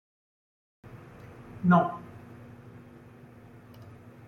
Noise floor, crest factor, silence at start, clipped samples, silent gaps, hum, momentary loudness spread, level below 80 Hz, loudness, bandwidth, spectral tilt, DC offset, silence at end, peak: -51 dBFS; 22 dB; 0.95 s; under 0.1%; none; none; 28 LU; -66 dBFS; -25 LUFS; 4 kHz; -9.5 dB/octave; under 0.1%; 0.45 s; -10 dBFS